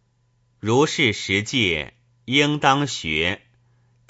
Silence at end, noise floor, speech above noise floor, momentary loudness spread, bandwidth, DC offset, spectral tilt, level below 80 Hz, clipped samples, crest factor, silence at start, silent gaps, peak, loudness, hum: 0.7 s; -64 dBFS; 44 dB; 9 LU; 8 kHz; under 0.1%; -4 dB/octave; -50 dBFS; under 0.1%; 20 dB; 0.65 s; none; -2 dBFS; -20 LUFS; none